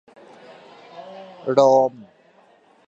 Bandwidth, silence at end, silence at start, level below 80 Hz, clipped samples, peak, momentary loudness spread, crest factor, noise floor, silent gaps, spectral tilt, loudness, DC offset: 7.8 kHz; 1 s; 0.95 s; -78 dBFS; under 0.1%; -2 dBFS; 26 LU; 22 dB; -55 dBFS; none; -6 dB/octave; -18 LUFS; under 0.1%